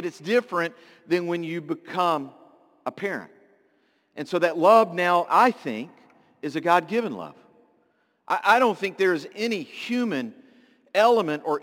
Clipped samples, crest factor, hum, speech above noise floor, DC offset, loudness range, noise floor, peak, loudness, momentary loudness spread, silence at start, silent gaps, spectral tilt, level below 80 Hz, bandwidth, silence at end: under 0.1%; 20 dB; none; 44 dB; under 0.1%; 7 LU; -67 dBFS; -4 dBFS; -23 LUFS; 17 LU; 0 s; none; -5 dB/octave; -80 dBFS; 17 kHz; 0.05 s